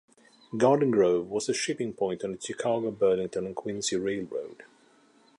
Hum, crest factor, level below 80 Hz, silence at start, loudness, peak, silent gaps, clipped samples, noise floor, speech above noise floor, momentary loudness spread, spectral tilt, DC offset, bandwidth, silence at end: none; 20 dB; -66 dBFS; 0.5 s; -28 LUFS; -8 dBFS; none; under 0.1%; -61 dBFS; 34 dB; 12 LU; -4.5 dB/octave; under 0.1%; 11.5 kHz; 0.75 s